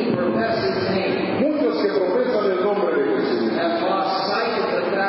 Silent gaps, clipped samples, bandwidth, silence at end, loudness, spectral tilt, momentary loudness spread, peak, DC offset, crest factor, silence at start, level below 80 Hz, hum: none; under 0.1%; 5.8 kHz; 0 s; -21 LUFS; -10 dB/octave; 1 LU; -6 dBFS; under 0.1%; 14 dB; 0 s; -58 dBFS; none